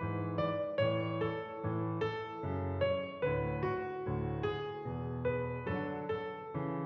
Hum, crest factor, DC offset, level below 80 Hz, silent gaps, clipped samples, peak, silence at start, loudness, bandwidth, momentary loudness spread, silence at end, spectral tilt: none; 16 dB; under 0.1%; -56 dBFS; none; under 0.1%; -20 dBFS; 0 s; -37 LUFS; 6.2 kHz; 6 LU; 0 s; -6 dB/octave